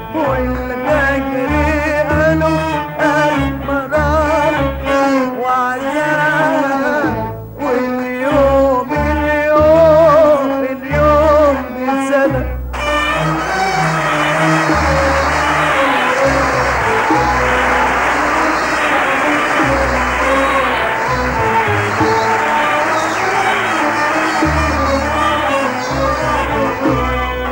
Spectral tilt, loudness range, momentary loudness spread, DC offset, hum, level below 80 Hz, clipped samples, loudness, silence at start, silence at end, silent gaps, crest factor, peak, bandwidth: -5 dB/octave; 3 LU; 6 LU; under 0.1%; none; -28 dBFS; under 0.1%; -14 LUFS; 0 s; 0 s; none; 14 dB; 0 dBFS; 16.5 kHz